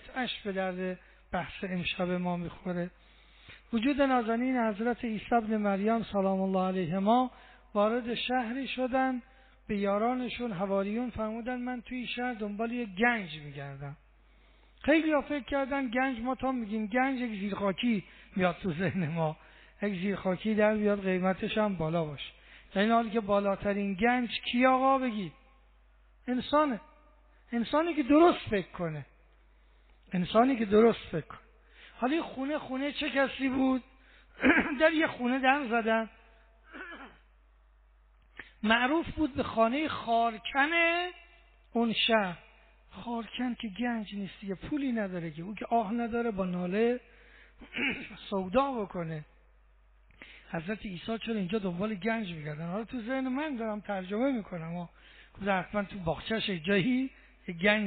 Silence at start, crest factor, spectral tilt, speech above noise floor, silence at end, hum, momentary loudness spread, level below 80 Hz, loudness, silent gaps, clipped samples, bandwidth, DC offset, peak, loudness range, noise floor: 0.05 s; 20 dB; -4 dB/octave; 31 dB; 0 s; none; 13 LU; -58 dBFS; -31 LUFS; none; under 0.1%; 4.6 kHz; under 0.1%; -10 dBFS; 6 LU; -61 dBFS